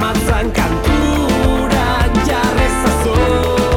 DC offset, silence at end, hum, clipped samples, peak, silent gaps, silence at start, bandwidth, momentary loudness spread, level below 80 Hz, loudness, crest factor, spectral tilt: under 0.1%; 0 s; none; under 0.1%; -4 dBFS; none; 0 s; 18 kHz; 2 LU; -20 dBFS; -15 LUFS; 10 dB; -5.5 dB/octave